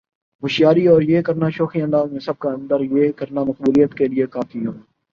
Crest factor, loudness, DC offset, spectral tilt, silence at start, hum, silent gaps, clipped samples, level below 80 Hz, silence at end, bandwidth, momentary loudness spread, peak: 16 dB; -18 LUFS; under 0.1%; -8 dB/octave; 0.4 s; none; none; under 0.1%; -58 dBFS; 0.35 s; 7.2 kHz; 11 LU; -2 dBFS